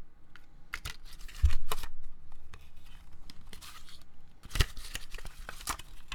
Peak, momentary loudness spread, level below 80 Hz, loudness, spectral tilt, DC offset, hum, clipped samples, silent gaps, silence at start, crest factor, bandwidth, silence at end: -10 dBFS; 24 LU; -38 dBFS; -38 LUFS; -3 dB/octave; under 0.1%; none; under 0.1%; none; 0 s; 20 dB; 16.5 kHz; 0 s